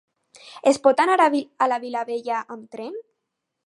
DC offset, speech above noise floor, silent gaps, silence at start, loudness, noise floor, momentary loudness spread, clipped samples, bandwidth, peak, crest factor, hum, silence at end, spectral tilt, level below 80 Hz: under 0.1%; 59 dB; none; 0.45 s; -21 LUFS; -80 dBFS; 18 LU; under 0.1%; 11.5 kHz; -2 dBFS; 20 dB; none; 0.65 s; -3 dB/octave; -76 dBFS